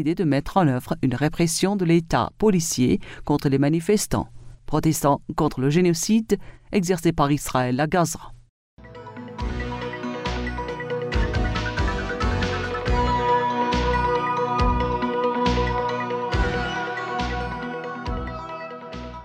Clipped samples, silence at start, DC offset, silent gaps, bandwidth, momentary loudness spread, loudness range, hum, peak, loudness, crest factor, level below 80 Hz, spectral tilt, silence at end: under 0.1%; 0 s; under 0.1%; 8.49-8.77 s; 16 kHz; 10 LU; 6 LU; none; -6 dBFS; -23 LUFS; 16 dB; -34 dBFS; -5.5 dB/octave; 0 s